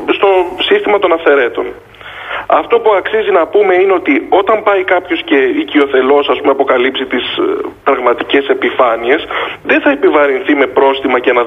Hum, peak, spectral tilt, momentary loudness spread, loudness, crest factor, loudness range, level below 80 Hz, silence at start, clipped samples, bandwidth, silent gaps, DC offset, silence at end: none; 0 dBFS; -5.5 dB/octave; 6 LU; -11 LUFS; 10 dB; 2 LU; -50 dBFS; 0 s; under 0.1%; 4 kHz; none; under 0.1%; 0 s